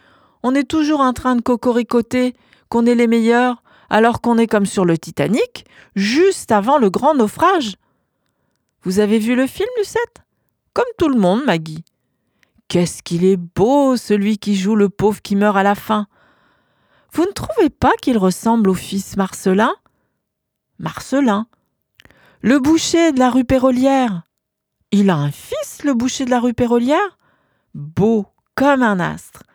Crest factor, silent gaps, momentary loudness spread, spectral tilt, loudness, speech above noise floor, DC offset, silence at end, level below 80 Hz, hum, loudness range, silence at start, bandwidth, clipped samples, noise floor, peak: 16 dB; none; 10 LU; -5.5 dB/octave; -16 LUFS; 61 dB; under 0.1%; 0.15 s; -48 dBFS; none; 4 LU; 0.45 s; 19.5 kHz; under 0.1%; -76 dBFS; 0 dBFS